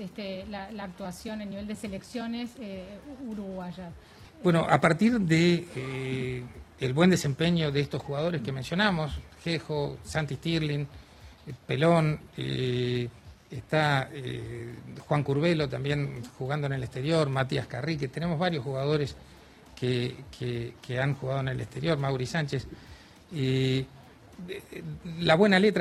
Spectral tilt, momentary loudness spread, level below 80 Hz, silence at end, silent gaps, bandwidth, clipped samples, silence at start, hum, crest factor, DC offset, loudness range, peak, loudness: -6.5 dB/octave; 17 LU; -54 dBFS; 0 s; none; 13.5 kHz; under 0.1%; 0 s; none; 22 dB; under 0.1%; 5 LU; -6 dBFS; -29 LUFS